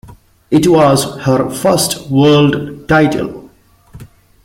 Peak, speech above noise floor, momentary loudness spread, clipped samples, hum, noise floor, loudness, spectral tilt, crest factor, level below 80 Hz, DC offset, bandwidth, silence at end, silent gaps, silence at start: 0 dBFS; 33 dB; 6 LU; under 0.1%; none; -45 dBFS; -12 LUFS; -5.5 dB/octave; 12 dB; -42 dBFS; under 0.1%; 16.5 kHz; 0.4 s; none; 0.5 s